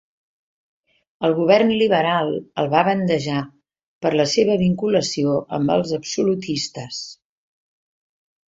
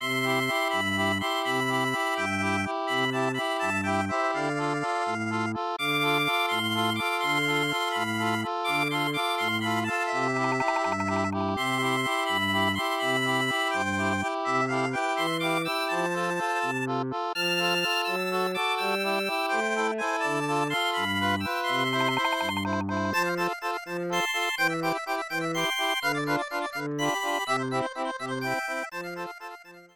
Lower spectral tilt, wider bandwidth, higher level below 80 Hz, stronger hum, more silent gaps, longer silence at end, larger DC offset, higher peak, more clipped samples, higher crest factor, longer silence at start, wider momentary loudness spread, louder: about the same, -5 dB/octave vs -4 dB/octave; second, 8 kHz vs 19.5 kHz; first, -58 dBFS vs -70 dBFS; neither; first, 3.86-4.01 s vs none; first, 1.45 s vs 0.1 s; neither; first, -2 dBFS vs -12 dBFS; neither; about the same, 20 dB vs 16 dB; first, 1.2 s vs 0 s; first, 11 LU vs 5 LU; first, -20 LUFS vs -27 LUFS